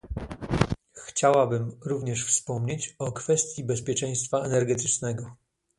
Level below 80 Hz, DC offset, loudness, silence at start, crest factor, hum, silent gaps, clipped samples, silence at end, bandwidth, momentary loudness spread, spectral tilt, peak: -46 dBFS; under 0.1%; -27 LUFS; 0.05 s; 26 dB; none; none; under 0.1%; 0.45 s; 11.5 kHz; 10 LU; -4.5 dB/octave; 0 dBFS